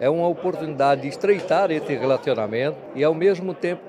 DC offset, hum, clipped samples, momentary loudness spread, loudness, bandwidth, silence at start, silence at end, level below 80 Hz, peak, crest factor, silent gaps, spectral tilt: under 0.1%; none; under 0.1%; 6 LU; -22 LUFS; 10.5 kHz; 0 s; 0 s; -70 dBFS; -6 dBFS; 16 dB; none; -6.5 dB/octave